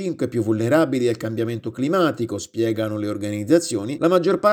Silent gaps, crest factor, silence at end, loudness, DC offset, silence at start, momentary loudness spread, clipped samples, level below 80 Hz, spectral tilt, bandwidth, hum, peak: none; 18 dB; 0 s; -21 LUFS; under 0.1%; 0 s; 8 LU; under 0.1%; -64 dBFS; -6 dB/octave; 17.5 kHz; none; -4 dBFS